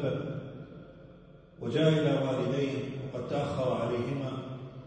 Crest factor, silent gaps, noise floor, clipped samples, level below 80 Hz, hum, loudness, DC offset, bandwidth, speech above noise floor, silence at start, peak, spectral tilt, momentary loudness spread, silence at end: 18 dB; none; -53 dBFS; under 0.1%; -62 dBFS; none; -31 LUFS; under 0.1%; 9 kHz; 24 dB; 0 s; -14 dBFS; -7.5 dB/octave; 18 LU; 0 s